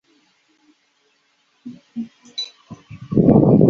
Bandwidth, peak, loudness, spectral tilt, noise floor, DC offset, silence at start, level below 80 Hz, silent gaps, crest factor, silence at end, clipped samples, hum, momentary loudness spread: 7 kHz; 0 dBFS; -19 LUFS; -9 dB/octave; -63 dBFS; under 0.1%; 1.65 s; -46 dBFS; none; 20 dB; 0 s; under 0.1%; none; 27 LU